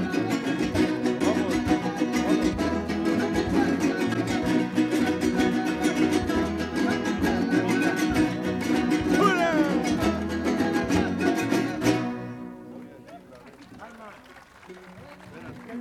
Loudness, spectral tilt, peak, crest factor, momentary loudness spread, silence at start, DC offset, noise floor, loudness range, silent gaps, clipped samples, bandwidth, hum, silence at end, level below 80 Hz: -25 LUFS; -5.5 dB/octave; -6 dBFS; 20 dB; 19 LU; 0 s; under 0.1%; -49 dBFS; 8 LU; none; under 0.1%; 14.5 kHz; none; 0 s; -46 dBFS